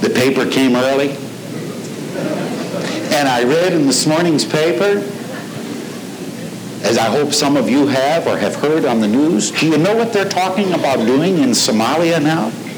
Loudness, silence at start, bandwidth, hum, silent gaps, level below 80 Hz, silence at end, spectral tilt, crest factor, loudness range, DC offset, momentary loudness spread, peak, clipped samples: -15 LUFS; 0 s; over 20 kHz; none; none; -62 dBFS; 0 s; -4.5 dB/octave; 12 dB; 3 LU; under 0.1%; 13 LU; -2 dBFS; under 0.1%